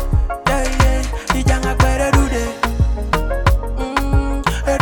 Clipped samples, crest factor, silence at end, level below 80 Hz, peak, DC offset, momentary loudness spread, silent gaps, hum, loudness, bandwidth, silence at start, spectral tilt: under 0.1%; 16 dB; 0 s; -18 dBFS; 0 dBFS; under 0.1%; 5 LU; none; none; -18 LUFS; 18.5 kHz; 0 s; -5.5 dB/octave